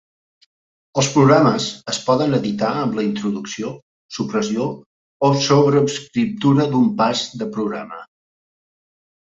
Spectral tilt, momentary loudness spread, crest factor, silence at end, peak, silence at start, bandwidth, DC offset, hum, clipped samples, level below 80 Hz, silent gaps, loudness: -5.5 dB/octave; 13 LU; 18 dB; 1.35 s; -2 dBFS; 0.95 s; 8 kHz; under 0.1%; none; under 0.1%; -58 dBFS; 3.82-4.09 s, 4.86-5.20 s; -18 LUFS